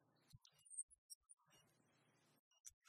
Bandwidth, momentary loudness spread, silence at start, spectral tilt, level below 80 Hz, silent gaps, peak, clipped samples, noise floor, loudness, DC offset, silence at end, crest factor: 14 kHz; 16 LU; 0 s; -0.5 dB/octave; -90 dBFS; 0.83-0.89 s, 0.98-1.09 s, 1.15-1.21 s, 2.39-2.51 s, 2.60-2.64 s, 2.73-2.81 s; -34 dBFS; under 0.1%; -79 dBFS; -57 LUFS; under 0.1%; 0 s; 30 dB